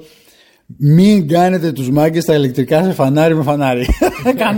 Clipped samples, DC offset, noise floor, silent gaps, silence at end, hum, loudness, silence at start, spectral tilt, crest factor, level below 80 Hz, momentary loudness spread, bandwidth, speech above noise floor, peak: under 0.1%; under 0.1%; -49 dBFS; none; 0 s; none; -13 LUFS; 0.7 s; -7 dB/octave; 12 dB; -30 dBFS; 5 LU; 17 kHz; 37 dB; -2 dBFS